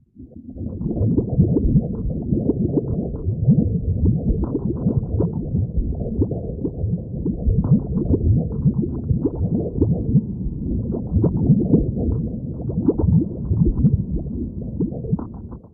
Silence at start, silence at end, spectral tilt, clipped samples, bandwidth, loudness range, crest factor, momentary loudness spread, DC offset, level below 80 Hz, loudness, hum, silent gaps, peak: 0.15 s; 0.05 s; -16.5 dB/octave; under 0.1%; 1.5 kHz; 2 LU; 18 dB; 9 LU; under 0.1%; -28 dBFS; -21 LUFS; none; none; -2 dBFS